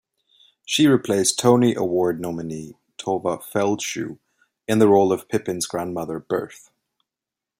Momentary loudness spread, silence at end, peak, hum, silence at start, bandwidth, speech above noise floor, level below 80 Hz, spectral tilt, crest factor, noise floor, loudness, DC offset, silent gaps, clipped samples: 16 LU; 1.05 s; -2 dBFS; none; 0.7 s; 16 kHz; 67 dB; -62 dBFS; -4.5 dB/octave; 20 dB; -87 dBFS; -21 LUFS; under 0.1%; none; under 0.1%